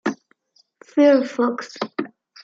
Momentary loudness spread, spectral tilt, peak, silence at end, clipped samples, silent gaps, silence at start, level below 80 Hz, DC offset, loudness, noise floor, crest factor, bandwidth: 17 LU; -5 dB/octave; -4 dBFS; 0.35 s; under 0.1%; none; 0.05 s; -78 dBFS; under 0.1%; -20 LUFS; -61 dBFS; 18 dB; 7.6 kHz